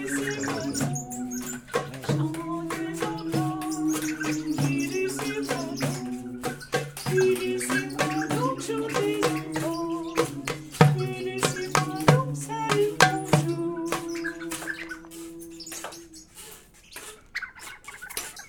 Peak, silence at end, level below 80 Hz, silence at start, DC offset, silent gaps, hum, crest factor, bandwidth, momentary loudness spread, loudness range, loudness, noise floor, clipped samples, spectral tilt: 0 dBFS; 0 s; -56 dBFS; 0 s; under 0.1%; none; none; 28 dB; 20 kHz; 18 LU; 11 LU; -27 LUFS; -48 dBFS; under 0.1%; -5 dB/octave